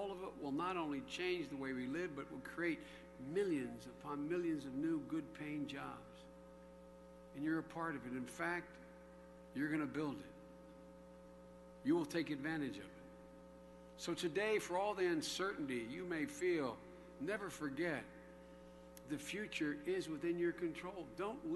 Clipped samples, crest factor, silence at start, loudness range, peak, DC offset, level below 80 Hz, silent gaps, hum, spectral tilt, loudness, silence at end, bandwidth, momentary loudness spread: under 0.1%; 18 dB; 0 s; 5 LU; -26 dBFS; under 0.1%; -70 dBFS; none; none; -5 dB/octave; -43 LUFS; 0 s; 12 kHz; 20 LU